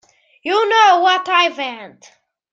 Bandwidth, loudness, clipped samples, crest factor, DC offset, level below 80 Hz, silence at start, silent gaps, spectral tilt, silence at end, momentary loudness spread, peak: 7.8 kHz; -14 LUFS; under 0.1%; 16 dB; under 0.1%; -78 dBFS; 0.45 s; none; -1 dB/octave; 0.65 s; 16 LU; -2 dBFS